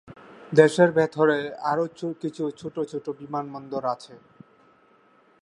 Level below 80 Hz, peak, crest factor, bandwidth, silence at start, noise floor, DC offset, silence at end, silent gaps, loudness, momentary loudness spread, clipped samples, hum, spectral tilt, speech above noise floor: -70 dBFS; -2 dBFS; 24 dB; 11 kHz; 0.05 s; -59 dBFS; under 0.1%; 1.25 s; none; -24 LUFS; 14 LU; under 0.1%; none; -6.5 dB/octave; 35 dB